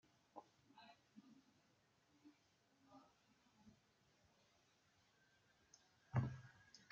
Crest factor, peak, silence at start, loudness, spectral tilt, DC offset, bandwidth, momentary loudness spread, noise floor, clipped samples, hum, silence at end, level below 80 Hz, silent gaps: 28 dB; -28 dBFS; 0.35 s; -47 LUFS; -7 dB/octave; under 0.1%; 7.4 kHz; 24 LU; -79 dBFS; under 0.1%; none; 0.15 s; -78 dBFS; none